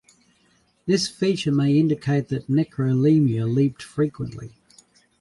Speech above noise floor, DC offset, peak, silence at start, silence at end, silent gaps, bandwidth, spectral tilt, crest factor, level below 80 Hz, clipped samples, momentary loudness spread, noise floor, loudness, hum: 42 dB; under 0.1%; -8 dBFS; 0.85 s; 0.7 s; none; 11.5 kHz; -7 dB/octave; 14 dB; -58 dBFS; under 0.1%; 15 LU; -63 dBFS; -22 LUFS; none